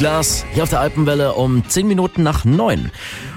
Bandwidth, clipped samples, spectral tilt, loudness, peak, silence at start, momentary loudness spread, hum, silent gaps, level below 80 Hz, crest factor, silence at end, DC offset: 16.5 kHz; under 0.1%; -5 dB/octave; -16 LUFS; -6 dBFS; 0 s; 4 LU; none; none; -30 dBFS; 10 dB; 0 s; under 0.1%